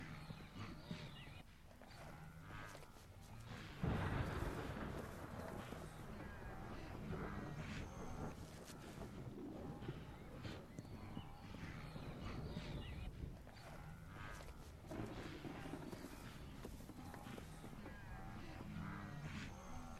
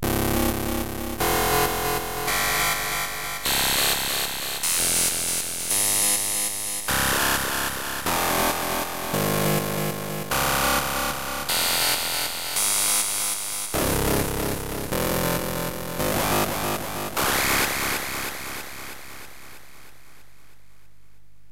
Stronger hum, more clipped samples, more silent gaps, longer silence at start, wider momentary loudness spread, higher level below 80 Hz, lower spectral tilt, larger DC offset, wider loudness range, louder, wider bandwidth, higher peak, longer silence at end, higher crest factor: second, none vs 50 Hz at -55 dBFS; neither; neither; about the same, 0 s vs 0 s; about the same, 9 LU vs 9 LU; second, -58 dBFS vs -40 dBFS; first, -6 dB/octave vs -2 dB/octave; second, under 0.1% vs 1%; about the same, 6 LU vs 5 LU; second, -52 LUFS vs -23 LUFS; about the same, 16.5 kHz vs 16.5 kHz; second, -30 dBFS vs -8 dBFS; second, 0 s vs 1.6 s; about the same, 20 dB vs 18 dB